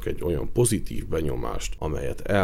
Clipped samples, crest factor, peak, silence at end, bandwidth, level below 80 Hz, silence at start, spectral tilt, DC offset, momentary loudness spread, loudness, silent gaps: under 0.1%; 16 dB; -10 dBFS; 0 s; 16 kHz; -34 dBFS; 0 s; -5.5 dB/octave; under 0.1%; 8 LU; -27 LUFS; none